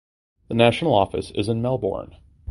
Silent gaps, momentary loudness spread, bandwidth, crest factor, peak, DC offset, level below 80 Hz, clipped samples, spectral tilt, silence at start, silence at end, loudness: none; 11 LU; 11.5 kHz; 22 dB; 0 dBFS; under 0.1%; -46 dBFS; under 0.1%; -6.5 dB/octave; 0.5 s; 0 s; -22 LUFS